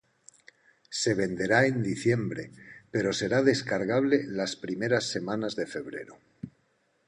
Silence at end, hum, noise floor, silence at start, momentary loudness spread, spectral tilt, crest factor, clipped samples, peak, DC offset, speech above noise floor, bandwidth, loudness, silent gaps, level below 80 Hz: 0.6 s; none; -71 dBFS; 0.9 s; 18 LU; -5 dB/octave; 20 dB; under 0.1%; -8 dBFS; under 0.1%; 43 dB; 10.5 kHz; -28 LUFS; none; -64 dBFS